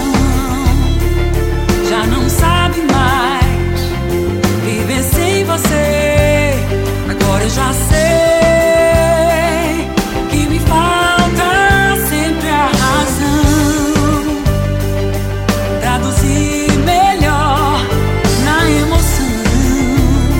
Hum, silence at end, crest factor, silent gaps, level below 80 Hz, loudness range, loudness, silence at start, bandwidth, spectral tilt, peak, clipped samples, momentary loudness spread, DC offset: none; 0 s; 12 dB; none; -20 dBFS; 2 LU; -13 LUFS; 0 s; 17 kHz; -5 dB/octave; 0 dBFS; under 0.1%; 6 LU; under 0.1%